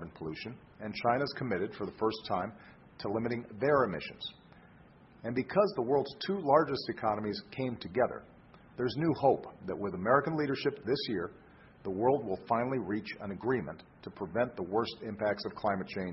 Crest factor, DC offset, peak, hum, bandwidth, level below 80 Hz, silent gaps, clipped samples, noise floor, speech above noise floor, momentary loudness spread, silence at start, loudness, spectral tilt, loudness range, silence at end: 22 dB; under 0.1%; -10 dBFS; none; 6 kHz; -62 dBFS; none; under 0.1%; -58 dBFS; 25 dB; 14 LU; 0 s; -33 LUFS; -9 dB/octave; 3 LU; 0 s